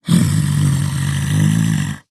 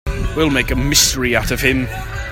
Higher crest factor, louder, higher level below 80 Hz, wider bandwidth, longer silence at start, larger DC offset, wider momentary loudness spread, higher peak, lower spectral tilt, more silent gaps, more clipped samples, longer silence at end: about the same, 14 dB vs 16 dB; about the same, -16 LUFS vs -15 LUFS; second, -40 dBFS vs -26 dBFS; second, 13.5 kHz vs 16.5 kHz; about the same, 0.05 s vs 0.05 s; neither; second, 4 LU vs 10 LU; about the same, -2 dBFS vs 0 dBFS; first, -5.5 dB/octave vs -3 dB/octave; neither; neither; about the same, 0.1 s vs 0 s